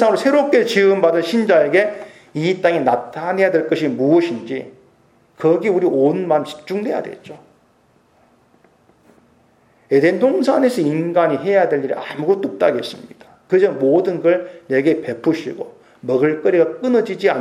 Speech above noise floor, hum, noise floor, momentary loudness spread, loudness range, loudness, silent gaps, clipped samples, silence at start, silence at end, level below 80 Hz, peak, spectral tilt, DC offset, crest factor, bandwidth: 40 dB; none; -56 dBFS; 11 LU; 6 LU; -17 LUFS; none; under 0.1%; 0 s; 0 s; -70 dBFS; 0 dBFS; -6.5 dB/octave; under 0.1%; 16 dB; 14 kHz